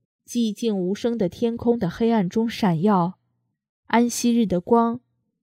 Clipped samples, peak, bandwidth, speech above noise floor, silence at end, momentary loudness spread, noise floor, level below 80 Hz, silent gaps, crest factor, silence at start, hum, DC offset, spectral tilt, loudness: under 0.1%; -6 dBFS; 15.5 kHz; 52 dB; 0.45 s; 6 LU; -73 dBFS; -56 dBFS; 3.69-3.83 s; 18 dB; 0.3 s; none; under 0.1%; -6 dB/octave; -22 LUFS